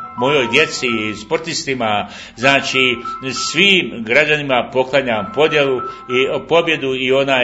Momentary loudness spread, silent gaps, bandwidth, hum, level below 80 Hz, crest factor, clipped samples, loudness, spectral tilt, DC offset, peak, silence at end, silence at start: 8 LU; none; 9.4 kHz; none; -52 dBFS; 16 dB; under 0.1%; -15 LUFS; -3.5 dB/octave; under 0.1%; 0 dBFS; 0 s; 0 s